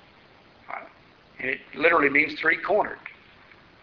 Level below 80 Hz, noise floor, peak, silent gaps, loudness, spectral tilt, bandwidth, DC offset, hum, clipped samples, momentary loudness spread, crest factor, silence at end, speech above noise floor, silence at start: -62 dBFS; -54 dBFS; -4 dBFS; none; -23 LUFS; -1.5 dB/octave; 6.4 kHz; under 0.1%; none; under 0.1%; 20 LU; 22 dB; 0.75 s; 31 dB; 0.7 s